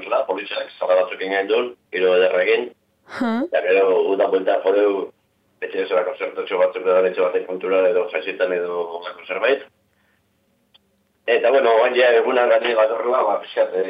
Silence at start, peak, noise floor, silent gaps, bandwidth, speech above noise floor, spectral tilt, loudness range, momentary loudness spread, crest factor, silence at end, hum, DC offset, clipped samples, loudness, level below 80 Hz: 0 s; -4 dBFS; -65 dBFS; none; 5.4 kHz; 46 dB; -6 dB/octave; 5 LU; 11 LU; 16 dB; 0 s; none; under 0.1%; under 0.1%; -19 LUFS; -78 dBFS